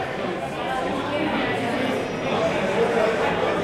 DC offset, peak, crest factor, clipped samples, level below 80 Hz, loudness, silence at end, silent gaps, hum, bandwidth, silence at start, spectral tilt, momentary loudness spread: under 0.1%; -10 dBFS; 14 dB; under 0.1%; -50 dBFS; -23 LUFS; 0 s; none; none; 15.5 kHz; 0 s; -5.5 dB/octave; 6 LU